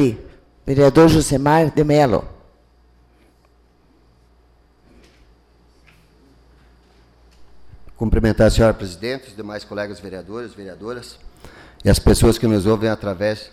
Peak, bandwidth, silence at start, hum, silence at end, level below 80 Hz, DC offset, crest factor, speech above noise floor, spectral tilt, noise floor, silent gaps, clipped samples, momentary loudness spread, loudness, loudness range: -4 dBFS; 16 kHz; 0 s; none; 0.05 s; -30 dBFS; under 0.1%; 16 dB; 38 dB; -6 dB/octave; -55 dBFS; none; under 0.1%; 19 LU; -17 LUFS; 10 LU